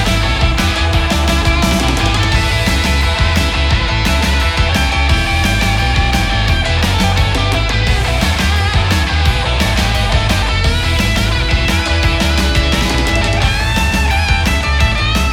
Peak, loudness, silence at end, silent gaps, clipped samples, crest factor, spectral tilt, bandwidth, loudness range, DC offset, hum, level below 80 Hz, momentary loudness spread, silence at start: 0 dBFS; -13 LUFS; 0 s; none; under 0.1%; 12 dB; -4.5 dB/octave; 16.5 kHz; 0 LU; under 0.1%; none; -16 dBFS; 1 LU; 0 s